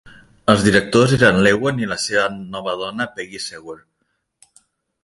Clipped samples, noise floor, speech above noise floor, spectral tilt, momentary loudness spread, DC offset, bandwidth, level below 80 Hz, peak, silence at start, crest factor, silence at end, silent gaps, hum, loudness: under 0.1%; -71 dBFS; 53 dB; -5 dB/octave; 16 LU; under 0.1%; 11.5 kHz; -46 dBFS; 0 dBFS; 0.05 s; 20 dB; 1.3 s; none; none; -17 LUFS